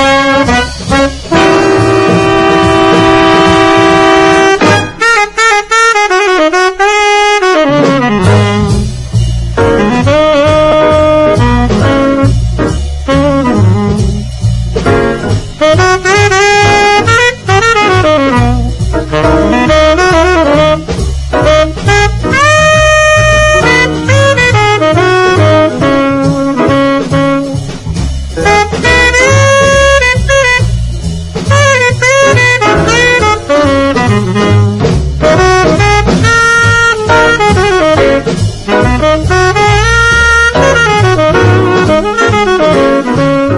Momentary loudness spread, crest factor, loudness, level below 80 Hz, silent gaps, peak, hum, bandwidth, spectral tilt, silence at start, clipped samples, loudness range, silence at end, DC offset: 7 LU; 6 dB; -7 LUFS; -20 dBFS; none; 0 dBFS; none; 11.5 kHz; -5 dB/octave; 0 s; 0.9%; 3 LU; 0 s; under 0.1%